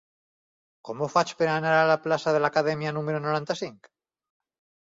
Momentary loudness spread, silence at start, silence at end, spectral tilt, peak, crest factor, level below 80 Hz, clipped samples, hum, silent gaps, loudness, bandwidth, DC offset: 11 LU; 0.85 s; 1.15 s; -5.5 dB/octave; -8 dBFS; 20 dB; -70 dBFS; under 0.1%; none; none; -25 LUFS; 7.8 kHz; under 0.1%